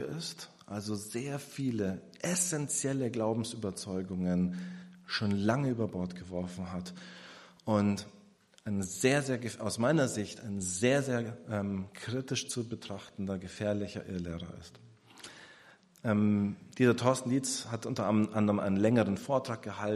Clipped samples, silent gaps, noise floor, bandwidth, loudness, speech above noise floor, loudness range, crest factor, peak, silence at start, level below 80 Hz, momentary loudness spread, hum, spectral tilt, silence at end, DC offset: under 0.1%; none; -61 dBFS; 14 kHz; -33 LUFS; 29 dB; 7 LU; 22 dB; -12 dBFS; 0 s; -66 dBFS; 15 LU; none; -5 dB/octave; 0 s; under 0.1%